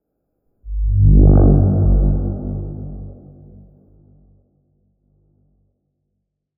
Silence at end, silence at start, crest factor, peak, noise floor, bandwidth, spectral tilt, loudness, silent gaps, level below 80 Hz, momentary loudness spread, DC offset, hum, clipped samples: 3.45 s; 0.65 s; 16 dB; -2 dBFS; -74 dBFS; 1.6 kHz; -17.5 dB/octave; -15 LUFS; none; -20 dBFS; 21 LU; under 0.1%; 50 Hz at -30 dBFS; under 0.1%